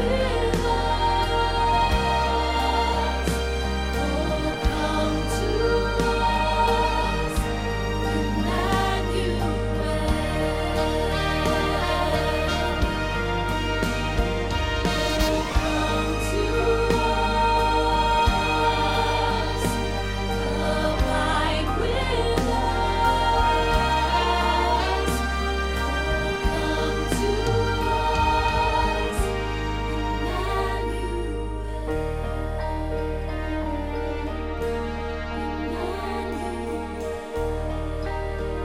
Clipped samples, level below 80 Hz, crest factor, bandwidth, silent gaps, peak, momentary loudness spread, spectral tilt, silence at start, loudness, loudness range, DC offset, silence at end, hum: under 0.1%; -30 dBFS; 16 dB; 16 kHz; none; -8 dBFS; 8 LU; -5 dB/octave; 0 s; -24 LUFS; 7 LU; 0.4%; 0 s; none